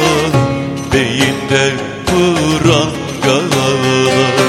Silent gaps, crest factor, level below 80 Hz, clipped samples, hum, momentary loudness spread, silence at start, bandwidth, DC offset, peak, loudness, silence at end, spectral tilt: none; 12 dB; -36 dBFS; under 0.1%; none; 5 LU; 0 s; 16 kHz; under 0.1%; 0 dBFS; -13 LUFS; 0 s; -4.5 dB/octave